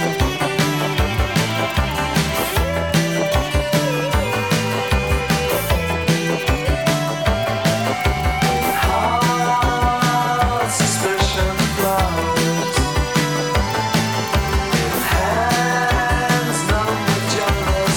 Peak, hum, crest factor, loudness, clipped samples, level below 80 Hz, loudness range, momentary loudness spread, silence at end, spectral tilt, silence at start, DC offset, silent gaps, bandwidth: -2 dBFS; none; 16 dB; -18 LUFS; under 0.1%; -26 dBFS; 1 LU; 2 LU; 0 s; -4.5 dB/octave; 0 s; 0.2%; none; 19.5 kHz